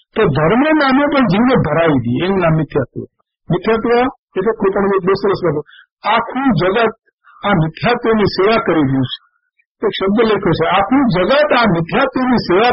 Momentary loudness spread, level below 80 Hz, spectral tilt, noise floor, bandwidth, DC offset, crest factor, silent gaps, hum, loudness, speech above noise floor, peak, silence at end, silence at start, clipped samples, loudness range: 8 LU; -40 dBFS; -5 dB/octave; -63 dBFS; 5.8 kHz; under 0.1%; 12 dB; 4.18-4.28 s, 5.91-5.97 s, 7.13-7.18 s, 9.66-9.75 s; none; -14 LUFS; 50 dB; -2 dBFS; 0 s; 0.15 s; under 0.1%; 2 LU